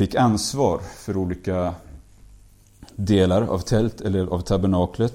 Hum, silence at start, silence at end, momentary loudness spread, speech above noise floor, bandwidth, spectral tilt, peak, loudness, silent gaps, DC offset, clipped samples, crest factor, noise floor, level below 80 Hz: none; 0 s; 0 s; 10 LU; 29 dB; 16 kHz; -6.5 dB/octave; -6 dBFS; -22 LUFS; none; under 0.1%; under 0.1%; 16 dB; -50 dBFS; -42 dBFS